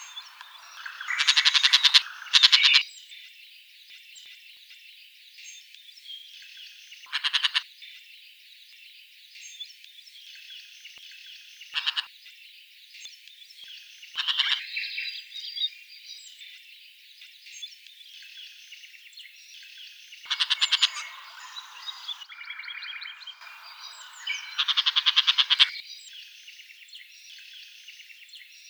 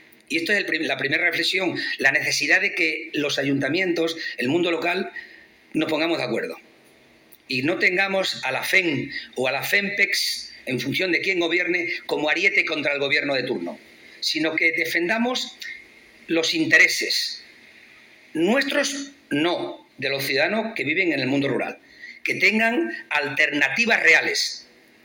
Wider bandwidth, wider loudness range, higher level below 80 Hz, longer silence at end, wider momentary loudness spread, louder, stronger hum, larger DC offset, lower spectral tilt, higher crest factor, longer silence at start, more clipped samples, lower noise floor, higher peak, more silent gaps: first, over 20 kHz vs 17 kHz; first, 24 LU vs 4 LU; second, under -90 dBFS vs -70 dBFS; second, 0 s vs 0.4 s; first, 27 LU vs 11 LU; about the same, -22 LUFS vs -21 LUFS; neither; neither; second, 8 dB/octave vs -3 dB/octave; first, 30 dB vs 18 dB; second, 0 s vs 0.3 s; neither; about the same, -52 dBFS vs -54 dBFS; first, 0 dBFS vs -6 dBFS; neither